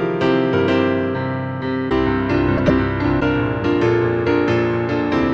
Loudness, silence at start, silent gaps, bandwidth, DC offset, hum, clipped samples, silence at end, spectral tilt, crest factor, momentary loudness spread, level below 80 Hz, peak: -18 LUFS; 0 s; none; 7.4 kHz; under 0.1%; none; under 0.1%; 0 s; -8 dB/octave; 16 dB; 5 LU; -36 dBFS; -2 dBFS